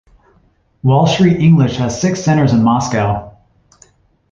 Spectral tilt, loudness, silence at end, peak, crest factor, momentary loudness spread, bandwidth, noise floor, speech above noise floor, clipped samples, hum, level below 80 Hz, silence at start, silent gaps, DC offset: -6.5 dB/octave; -13 LUFS; 1.05 s; -2 dBFS; 12 dB; 7 LU; 7.6 kHz; -55 dBFS; 43 dB; under 0.1%; none; -42 dBFS; 0.85 s; none; under 0.1%